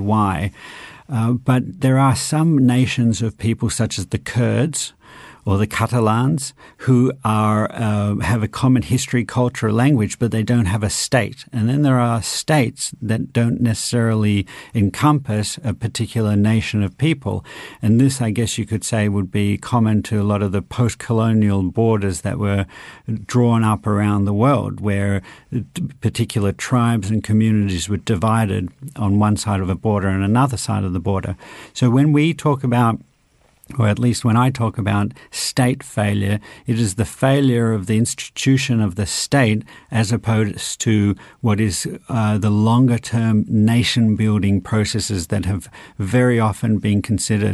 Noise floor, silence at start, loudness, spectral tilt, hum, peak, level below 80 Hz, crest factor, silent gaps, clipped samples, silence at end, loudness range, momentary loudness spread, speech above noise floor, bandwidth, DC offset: -57 dBFS; 0 s; -18 LUFS; -6 dB/octave; none; -2 dBFS; -46 dBFS; 16 dB; none; under 0.1%; 0 s; 2 LU; 8 LU; 39 dB; 12.5 kHz; under 0.1%